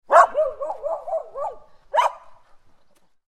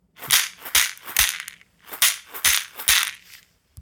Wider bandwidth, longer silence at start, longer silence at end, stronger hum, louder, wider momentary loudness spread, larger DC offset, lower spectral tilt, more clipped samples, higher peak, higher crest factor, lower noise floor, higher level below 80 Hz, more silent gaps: second, 13.5 kHz vs 19 kHz; about the same, 0.1 s vs 0.2 s; first, 0.95 s vs 0 s; neither; second, -22 LUFS vs -19 LUFS; first, 16 LU vs 10 LU; neither; first, -1 dB/octave vs 2.5 dB/octave; neither; about the same, -2 dBFS vs 0 dBFS; about the same, 22 dB vs 24 dB; first, -56 dBFS vs -51 dBFS; second, -58 dBFS vs -50 dBFS; neither